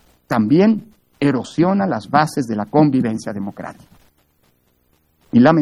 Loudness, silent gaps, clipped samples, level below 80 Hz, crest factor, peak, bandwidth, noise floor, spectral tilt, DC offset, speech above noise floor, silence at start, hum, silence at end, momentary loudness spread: -17 LUFS; none; under 0.1%; -58 dBFS; 18 dB; 0 dBFS; 12.5 kHz; -61 dBFS; -7.5 dB/octave; under 0.1%; 45 dB; 0.3 s; none; 0 s; 13 LU